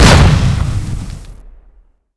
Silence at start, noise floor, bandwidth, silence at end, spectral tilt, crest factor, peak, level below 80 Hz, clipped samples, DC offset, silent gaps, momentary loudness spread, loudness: 0 s; -47 dBFS; 11 kHz; 0.75 s; -5 dB/octave; 12 dB; 0 dBFS; -18 dBFS; 2%; under 0.1%; none; 21 LU; -12 LUFS